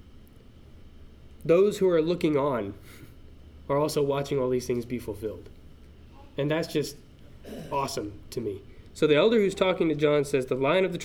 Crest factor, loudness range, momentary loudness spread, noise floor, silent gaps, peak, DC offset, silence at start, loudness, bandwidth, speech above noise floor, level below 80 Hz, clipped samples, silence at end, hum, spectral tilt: 18 dB; 7 LU; 16 LU; -50 dBFS; none; -8 dBFS; under 0.1%; 0.05 s; -26 LUFS; 17.5 kHz; 24 dB; -52 dBFS; under 0.1%; 0 s; none; -6 dB/octave